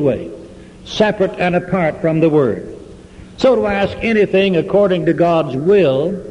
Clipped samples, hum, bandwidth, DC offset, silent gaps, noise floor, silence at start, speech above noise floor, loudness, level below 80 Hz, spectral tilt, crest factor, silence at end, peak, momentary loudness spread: under 0.1%; none; 10.5 kHz; under 0.1%; none; -37 dBFS; 0 s; 23 dB; -15 LUFS; -42 dBFS; -7 dB/octave; 12 dB; 0 s; -2 dBFS; 12 LU